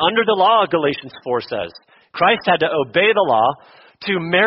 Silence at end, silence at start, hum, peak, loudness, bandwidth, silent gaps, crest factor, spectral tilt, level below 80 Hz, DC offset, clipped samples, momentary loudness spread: 0 s; 0 s; none; -2 dBFS; -17 LUFS; 5.8 kHz; none; 16 dB; -1.5 dB/octave; -58 dBFS; under 0.1%; under 0.1%; 14 LU